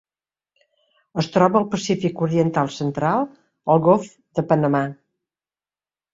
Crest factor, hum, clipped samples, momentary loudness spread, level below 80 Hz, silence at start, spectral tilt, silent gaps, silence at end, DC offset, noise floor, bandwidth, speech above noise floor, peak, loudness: 20 dB; none; under 0.1%; 11 LU; -60 dBFS; 1.15 s; -7 dB/octave; none; 1.2 s; under 0.1%; under -90 dBFS; 7.8 kHz; over 71 dB; -2 dBFS; -21 LUFS